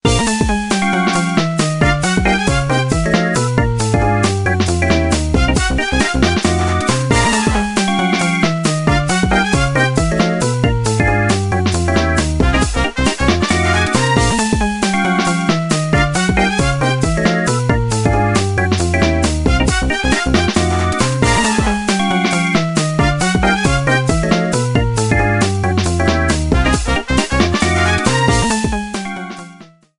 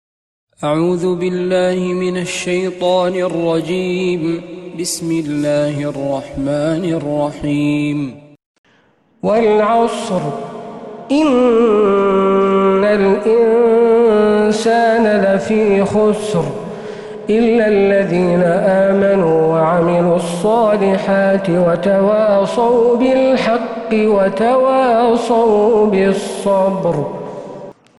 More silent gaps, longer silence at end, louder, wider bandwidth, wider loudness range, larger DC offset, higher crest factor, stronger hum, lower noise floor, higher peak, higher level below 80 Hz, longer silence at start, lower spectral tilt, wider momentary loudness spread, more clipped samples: second, none vs 8.46-8.64 s; about the same, 0.35 s vs 0.25 s; about the same, -15 LUFS vs -14 LUFS; about the same, 11.5 kHz vs 12 kHz; second, 0 LU vs 6 LU; neither; about the same, 14 dB vs 12 dB; neither; second, -41 dBFS vs -54 dBFS; about the same, 0 dBFS vs -2 dBFS; first, -24 dBFS vs -48 dBFS; second, 0.05 s vs 0.6 s; about the same, -5 dB/octave vs -6 dB/octave; second, 2 LU vs 9 LU; neither